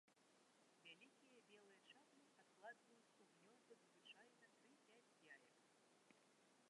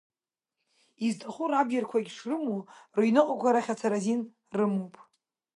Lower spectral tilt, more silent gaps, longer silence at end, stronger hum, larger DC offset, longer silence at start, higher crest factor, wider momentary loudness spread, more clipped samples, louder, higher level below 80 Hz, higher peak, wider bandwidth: second, -2.5 dB/octave vs -6 dB/octave; neither; second, 0 s vs 0.55 s; neither; neither; second, 0.05 s vs 1 s; about the same, 22 dB vs 20 dB; second, 5 LU vs 10 LU; neither; second, -67 LUFS vs -29 LUFS; second, under -90 dBFS vs -82 dBFS; second, -48 dBFS vs -10 dBFS; about the same, 11 kHz vs 11 kHz